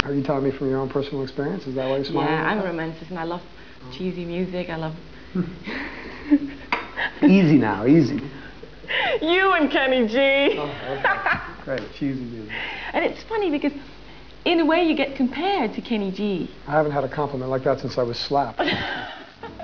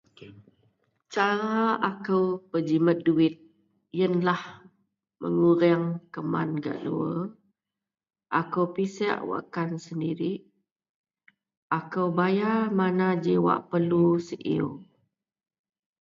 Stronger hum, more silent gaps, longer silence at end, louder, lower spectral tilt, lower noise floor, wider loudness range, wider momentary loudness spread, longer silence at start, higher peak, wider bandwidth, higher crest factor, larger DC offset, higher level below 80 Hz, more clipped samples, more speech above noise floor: neither; second, none vs 10.71-10.76 s, 10.89-11.04 s, 11.57-11.70 s; second, 0 s vs 1.2 s; first, -23 LUFS vs -26 LUFS; about the same, -7 dB/octave vs -7.5 dB/octave; second, -44 dBFS vs -90 dBFS; about the same, 8 LU vs 6 LU; first, 13 LU vs 9 LU; second, 0 s vs 0.2 s; first, 0 dBFS vs -8 dBFS; second, 5.4 kHz vs 7.4 kHz; about the same, 22 dB vs 20 dB; first, 0.6% vs under 0.1%; first, -50 dBFS vs -70 dBFS; neither; second, 22 dB vs 64 dB